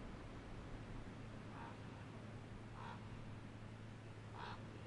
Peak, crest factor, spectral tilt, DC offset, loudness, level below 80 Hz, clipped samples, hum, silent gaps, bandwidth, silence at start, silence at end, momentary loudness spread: -40 dBFS; 14 dB; -6.5 dB/octave; under 0.1%; -54 LUFS; -60 dBFS; under 0.1%; none; none; 11 kHz; 0 s; 0 s; 3 LU